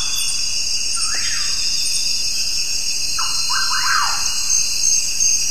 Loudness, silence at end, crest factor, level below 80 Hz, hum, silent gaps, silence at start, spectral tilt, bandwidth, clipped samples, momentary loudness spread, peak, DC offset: -17 LUFS; 0 s; 14 dB; -42 dBFS; none; none; 0 s; 2.5 dB/octave; 14 kHz; under 0.1%; 4 LU; -4 dBFS; 8%